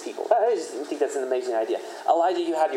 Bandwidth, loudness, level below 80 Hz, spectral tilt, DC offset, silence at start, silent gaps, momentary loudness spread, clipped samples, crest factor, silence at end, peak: 14 kHz; -25 LUFS; under -90 dBFS; -2.5 dB/octave; under 0.1%; 0 s; none; 7 LU; under 0.1%; 20 dB; 0 s; -6 dBFS